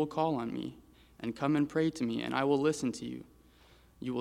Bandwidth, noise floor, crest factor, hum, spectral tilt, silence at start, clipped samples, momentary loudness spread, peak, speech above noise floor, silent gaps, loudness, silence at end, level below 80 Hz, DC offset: 14 kHz; -61 dBFS; 20 dB; none; -6 dB/octave; 0 s; under 0.1%; 14 LU; -14 dBFS; 29 dB; none; -33 LUFS; 0 s; -64 dBFS; under 0.1%